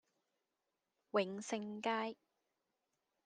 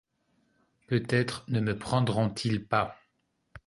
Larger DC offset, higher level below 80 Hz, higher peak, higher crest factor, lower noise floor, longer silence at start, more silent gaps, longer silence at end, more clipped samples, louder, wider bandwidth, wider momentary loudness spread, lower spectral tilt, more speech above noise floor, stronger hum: neither; second, under -90 dBFS vs -58 dBFS; second, -24 dBFS vs -10 dBFS; about the same, 22 dB vs 22 dB; first, -89 dBFS vs -76 dBFS; first, 1.15 s vs 0.9 s; neither; first, 1.15 s vs 0.1 s; neither; second, -41 LUFS vs -29 LUFS; second, 9.6 kHz vs 11.5 kHz; first, 7 LU vs 4 LU; second, -4 dB/octave vs -6.5 dB/octave; about the same, 49 dB vs 47 dB; neither